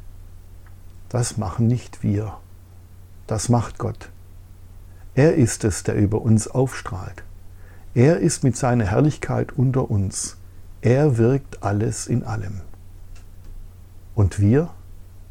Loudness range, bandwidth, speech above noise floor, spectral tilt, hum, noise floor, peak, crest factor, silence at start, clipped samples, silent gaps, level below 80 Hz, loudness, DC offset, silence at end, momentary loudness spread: 5 LU; 14 kHz; 23 dB; -6.5 dB/octave; none; -43 dBFS; -4 dBFS; 18 dB; 0.05 s; under 0.1%; none; -40 dBFS; -21 LUFS; under 0.1%; 0.1 s; 13 LU